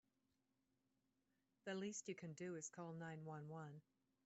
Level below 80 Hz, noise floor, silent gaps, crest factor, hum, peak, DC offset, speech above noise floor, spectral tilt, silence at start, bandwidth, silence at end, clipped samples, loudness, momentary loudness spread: under -90 dBFS; -88 dBFS; none; 18 dB; none; -38 dBFS; under 0.1%; 35 dB; -5.5 dB/octave; 1.65 s; 8 kHz; 0.45 s; under 0.1%; -53 LUFS; 8 LU